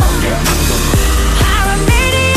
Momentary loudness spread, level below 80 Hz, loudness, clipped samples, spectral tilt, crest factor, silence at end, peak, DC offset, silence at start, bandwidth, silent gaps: 2 LU; -14 dBFS; -12 LUFS; under 0.1%; -4 dB/octave; 10 dB; 0 s; 0 dBFS; under 0.1%; 0 s; 14.5 kHz; none